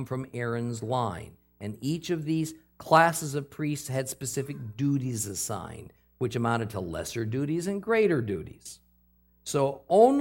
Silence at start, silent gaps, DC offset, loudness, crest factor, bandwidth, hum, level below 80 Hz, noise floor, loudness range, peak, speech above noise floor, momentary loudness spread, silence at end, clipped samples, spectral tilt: 0 s; none; under 0.1%; -28 LUFS; 22 dB; 17 kHz; none; -62 dBFS; -64 dBFS; 4 LU; -6 dBFS; 36 dB; 18 LU; 0 s; under 0.1%; -5.5 dB/octave